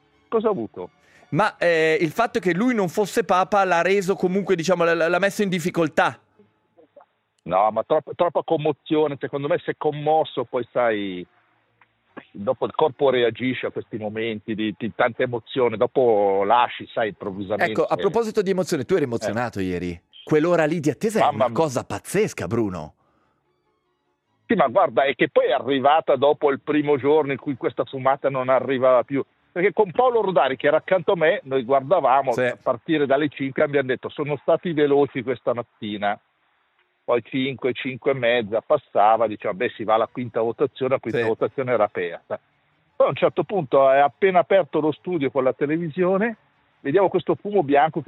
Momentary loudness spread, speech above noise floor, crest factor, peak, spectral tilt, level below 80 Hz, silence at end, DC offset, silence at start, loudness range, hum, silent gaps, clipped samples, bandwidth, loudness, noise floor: 9 LU; 50 dB; 18 dB; -4 dBFS; -6 dB/octave; -66 dBFS; 0.05 s; under 0.1%; 0.3 s; 4 LU; none; none; under 0.1%; 15 kHz; -22 LUFS; -71 dBFS